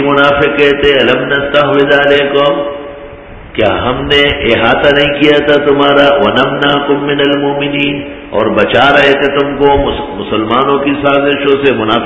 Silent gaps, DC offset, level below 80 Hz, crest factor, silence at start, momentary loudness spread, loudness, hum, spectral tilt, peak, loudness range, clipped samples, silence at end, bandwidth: none; 0.2%; -32 dBFS; 10 dB; 0 s; 8 LU; -9 LUFS; none; -6.5 dB/octave; 0 dBFS; 2 LU; 0.5%; 0 s; 8 kHz